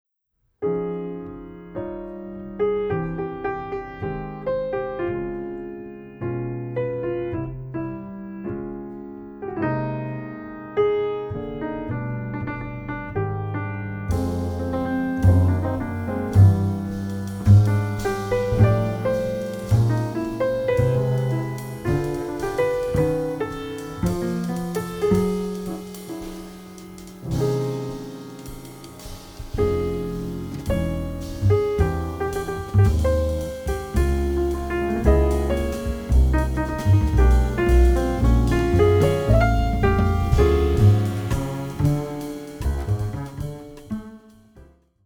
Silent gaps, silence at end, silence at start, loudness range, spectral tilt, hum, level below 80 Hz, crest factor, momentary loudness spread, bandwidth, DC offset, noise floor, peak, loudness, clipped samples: none; 0.4 s; 0.6 s; 10 LU; -8 dB/octave; none; -28 dBFS; 18 dB; 16 LU; 17.5 kHz; under 0.1%; -71 dBFS; -4 dBFS; -23 LUFS; under 0.1%